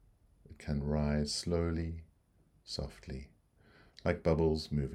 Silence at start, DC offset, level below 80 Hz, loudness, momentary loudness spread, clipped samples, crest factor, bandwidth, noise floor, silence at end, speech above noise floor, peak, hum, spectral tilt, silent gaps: 0.5 s; under 0.1%; -48 dBFS; -35 LUFS; 16 LU; under 0.1%; 22 dB; 12.5 kHz; -69 dBFS; 0 s; 35 dB; -14 dBFS; none; -6 dB/octave; none